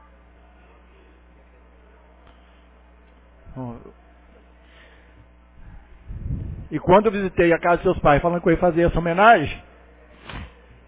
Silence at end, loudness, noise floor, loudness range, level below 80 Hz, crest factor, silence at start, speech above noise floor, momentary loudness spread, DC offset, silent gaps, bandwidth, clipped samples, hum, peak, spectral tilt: 0.4 s; -19 LUFS; -51 dBFS; 25 LU; -40 dBFS; 22 dB; 3.45 s; 32 dB; 23 LU; under 0.1%; none; 4 kHz; under 0.1%; 60 Hz at -50 dBFS; -2 dBFS; -10.5 dB/octave